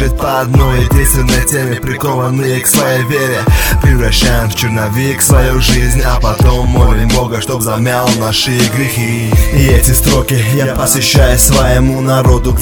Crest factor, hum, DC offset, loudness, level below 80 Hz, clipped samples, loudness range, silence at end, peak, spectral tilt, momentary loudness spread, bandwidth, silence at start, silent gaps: 10 dB; none; under 0.1%; -10 LUFS; -14 dBFS; 0.3%; 2 LU; 0 s; 0 dBFS; -4.5 dB/octave; 5 LU; over 20 kHz; 0 s; none